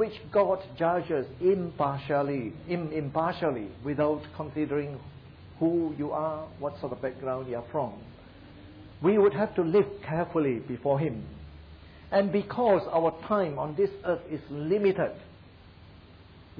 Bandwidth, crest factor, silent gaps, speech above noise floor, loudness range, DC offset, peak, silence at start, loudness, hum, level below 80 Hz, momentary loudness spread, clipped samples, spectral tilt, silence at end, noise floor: 5.2 kHz; 16 dB; none; 24 dB; 5 LU; under 0.1%; -14 dBFS; 0 s; -29 LUFS; none; -56 dBFS; 14 LU; under 0.1%; -10.5 dB/octave; 0 s; -52 dBFS